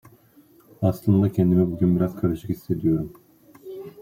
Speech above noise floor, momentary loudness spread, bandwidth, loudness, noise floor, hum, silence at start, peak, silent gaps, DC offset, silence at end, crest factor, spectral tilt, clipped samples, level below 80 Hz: 33 dB; 17 LU; 16 kHz; -22 LUFS; -55 dBFS; none; 0.8 s; -6 dBFS; none; under 0.1%; 0 s; 16 dB; -10 dB/octave; under 0.1%; -52 dBFS